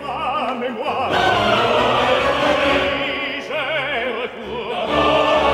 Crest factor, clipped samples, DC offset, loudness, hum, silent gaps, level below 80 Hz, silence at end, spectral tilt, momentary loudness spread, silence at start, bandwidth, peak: 14 dB; under 0.1%; under 0.1%; -18 LUFS; none; none; -42 dBFS; 0 s; -4.5 dB/octave; 8 LU; 0 s; 15 kHz; -4 dBFS